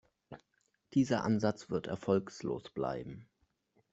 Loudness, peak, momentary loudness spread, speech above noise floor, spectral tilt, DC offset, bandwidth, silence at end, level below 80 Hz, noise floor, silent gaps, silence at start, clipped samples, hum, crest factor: -35 LUFS; -16 dBFS; 24 LU; 44 dB; -6.5 dB/octave; under 0.1%; 8 kHz; 0.7 s; -68 dBFS; -78 dBFS; none; 0.3 s; under 0.1%; none; 20 dB